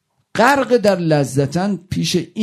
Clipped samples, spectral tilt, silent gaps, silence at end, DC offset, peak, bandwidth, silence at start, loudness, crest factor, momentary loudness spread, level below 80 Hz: under 0.1%; -5.5 dB/octave; none; 0 s; under 0.1%; 0 dBFS; 14.5 kHz; 0.35 s; -16 LUFS; 16 dB; 7 LU; -50 dBFS